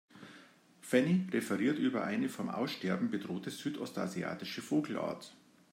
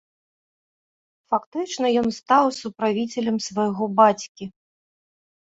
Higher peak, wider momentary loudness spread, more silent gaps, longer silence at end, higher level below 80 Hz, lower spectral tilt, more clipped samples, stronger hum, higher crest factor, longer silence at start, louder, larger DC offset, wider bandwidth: second, -14 dBFS vs -4 dBFS; first, 15 LU vs 12 LU; second, none vs 1.46-1.52 s, 4.29-4.35 s; second, 0.35 s vs 0.9 s; second, -80 dBFS vs -66 dBFS; first, -6 dB/octave vs -4.5 dB/octave; neither; neither; about the same, 20 dB vs 20 dB; second, 0.15 s vs 1.3 s; second, -35 LUFS vs -22 LUFS; neither; first, 16 kHz vs 8 kHz